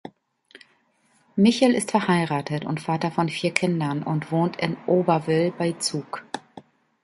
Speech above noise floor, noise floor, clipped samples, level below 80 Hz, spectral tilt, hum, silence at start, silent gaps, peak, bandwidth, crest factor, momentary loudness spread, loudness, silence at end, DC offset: 41 dB; -64 dBFS; under 0.1%; -66 dBFS; -5.5 dB/octave; none; 0.05 s; none; -2 dBFS; 11.5 kHz; 24 dB; 11 LU; -23 LUFS; 0.45 s; under 0.1%